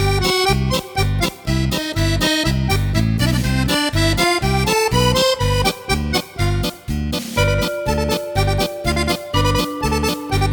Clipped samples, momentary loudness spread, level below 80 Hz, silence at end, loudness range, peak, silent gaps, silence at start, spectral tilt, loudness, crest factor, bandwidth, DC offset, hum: under 0.1%; 5 LU; -26 dBFS; 0 s; 3 LU; 0 dBFS; none; 0 s; -4.5 dB/octave; -18 LUFS; 16 dB; 19.5 kHz; under 0.1%; none